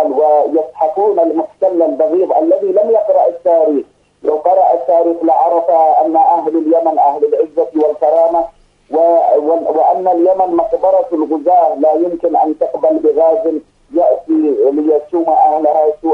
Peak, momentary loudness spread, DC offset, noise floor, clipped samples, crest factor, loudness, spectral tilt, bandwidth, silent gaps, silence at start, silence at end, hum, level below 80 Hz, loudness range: 0 dBFS; 5 LU; under 0.1%; -31 dBFS; under 0.1%; 12 dB; -12 LUFS; -8 dB/octave; 4.2 kHz; none; 0 s; 0 s; 50 Hz at -60 dBFS; -56 dBFS; 1 LU